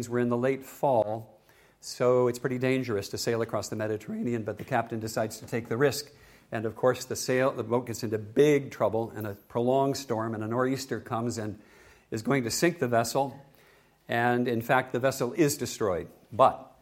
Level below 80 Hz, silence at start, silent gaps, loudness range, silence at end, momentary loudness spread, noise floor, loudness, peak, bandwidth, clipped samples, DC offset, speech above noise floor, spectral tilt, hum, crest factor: -64 dBFS; 0 s; none; 3 LU; 0.15 s; 11 LU; -60 dBFS; -28 LUFS; -8 dBFS; 16.5 kHz; under 0.1%; under 0.1%; 32 dB; -5 dB/octave; none; 22 dB